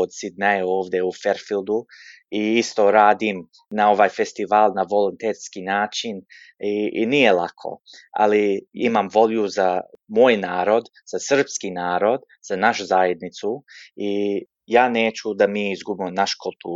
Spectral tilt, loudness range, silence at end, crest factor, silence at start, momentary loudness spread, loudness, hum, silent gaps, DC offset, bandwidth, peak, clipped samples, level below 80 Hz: -4 dB/octave; 3 LU; 0 s; 18 dB; 0 s; 13 LU; -21 LUFS; none; none; under 0.1%; 7.8 kHz; -2 dBFS; under 0.1%; -70 dBFS